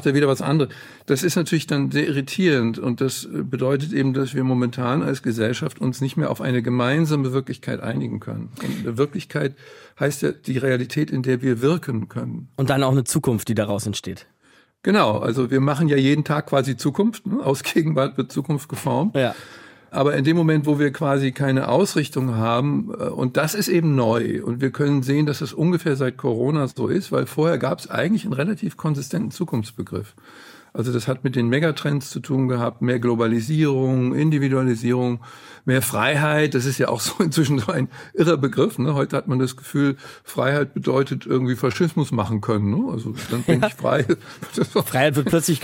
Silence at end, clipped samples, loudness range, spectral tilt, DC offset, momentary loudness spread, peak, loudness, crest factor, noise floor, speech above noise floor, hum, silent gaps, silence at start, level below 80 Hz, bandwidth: 0 s; under 0.1%; 4 LU; -6 dB/octave; under 0.1%; 8 LU; -4 dBFS; -21 LUFS; 18 dB; -57 dBFS; 36 dB; none; none; 0 s; -60 dBFS; 17 kHz